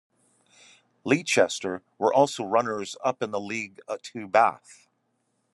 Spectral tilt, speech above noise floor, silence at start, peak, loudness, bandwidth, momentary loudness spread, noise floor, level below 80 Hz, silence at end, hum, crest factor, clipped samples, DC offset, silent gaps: -4 dB/octave; 48 dB; 1.05 s; -4 dBFS; -26 LUFS; 12 kHz; 13 LU; -74 dBFS; -76 dBFS; 0.8 s; none; 22 dB; under 0.1%; under 0.1%; none